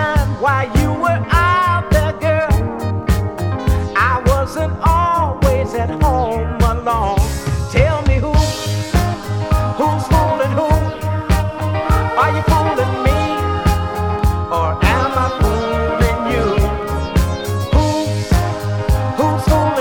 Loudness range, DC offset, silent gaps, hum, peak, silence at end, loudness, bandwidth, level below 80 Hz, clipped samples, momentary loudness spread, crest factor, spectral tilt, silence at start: 1 LU; under 0.1%; none; none; 0 dBFS; 0 s; -16 LUFS; 19 kHz; -22 dBFS; under 0.1%; 5 LU; 16 dB; -6.5 dB/octave; 0 s